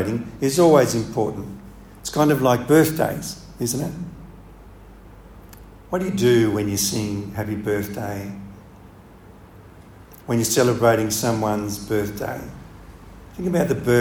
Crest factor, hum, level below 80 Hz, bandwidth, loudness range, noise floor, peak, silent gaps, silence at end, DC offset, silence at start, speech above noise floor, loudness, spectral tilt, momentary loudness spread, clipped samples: 20 dB; none; -46 dBFS; over 20 kHz; 8 LU; -45 dBFS; -2 dBFS; none; 0 s; under 0.1%; 0 s; 25 dB; -21 LUFS; -5 dB/octave; 18 LU; under 0.1%